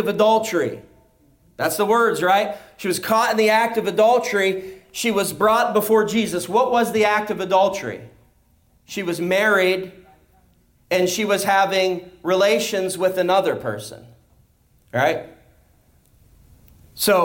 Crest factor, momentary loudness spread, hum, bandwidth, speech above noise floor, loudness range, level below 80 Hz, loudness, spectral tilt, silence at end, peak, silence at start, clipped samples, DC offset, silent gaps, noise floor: 14 dB; 12 LU; none; 17 kHz; 39 dB; 5 LU; -60 dBFS; -19 LUFS; -3.5 dB/octave; 0 s; -6 dBFS; 0 s; under 0.1%; under 0.1%; none; -59 dBFS